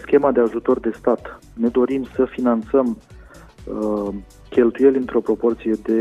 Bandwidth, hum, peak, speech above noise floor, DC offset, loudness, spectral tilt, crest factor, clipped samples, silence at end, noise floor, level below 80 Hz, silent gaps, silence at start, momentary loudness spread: 9.8 kHz; none; -2 dBFS; 23 dB; under 0.1%; -20 LUFS; -8 dB/octave; 18 dB; under 0.1%; 0 s; -42 dBFS; -46 dBFS; none; 0 s; 12 LU